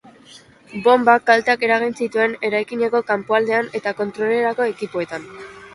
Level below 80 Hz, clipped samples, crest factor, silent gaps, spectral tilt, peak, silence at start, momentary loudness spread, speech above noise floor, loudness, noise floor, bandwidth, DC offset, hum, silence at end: -64 dBFS; under 0.1%; 18 dB; none; -5 dB/octave; 0 dBFS; 0.35 s; 13 LU; 28 dB; -19 LUFS; -46 dBFS; 11.5 kHz; under 0.1%; none; 0.05 s